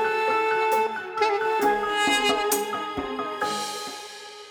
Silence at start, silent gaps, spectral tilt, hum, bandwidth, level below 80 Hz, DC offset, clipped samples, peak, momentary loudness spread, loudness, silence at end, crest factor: 0 s; none; -1.5 dB/octave; none; over 20 kHz; -58 dBFS; under 0.1%; under 0.1%; -10 dBFS; 11 LU; -24 LUFS; 0 s; 16 dB